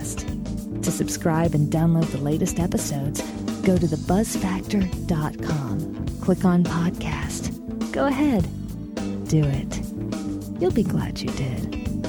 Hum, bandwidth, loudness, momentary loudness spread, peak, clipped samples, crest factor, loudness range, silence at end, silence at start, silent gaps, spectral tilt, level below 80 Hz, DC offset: none; 19.5 kHz; -24 LUFS; 9 LU; -6 dBFS; under 0.1%; 16 dB; 2 LU; 0 s; 0 s; none; -6.5 dB/octave; -38 dBFS; under 0.1%